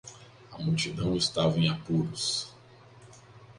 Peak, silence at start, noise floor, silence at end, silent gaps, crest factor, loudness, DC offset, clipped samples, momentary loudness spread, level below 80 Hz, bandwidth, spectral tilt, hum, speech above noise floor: -14 dBFS; 0.05 s; -54 dBFS; 0.05 s; none; 18 dB; -29 LUFS; under 0.1%; under 0.1%; 15 LU; -56 dBFS; 11.5 kHz; -5 dB/octave; none; 25 dB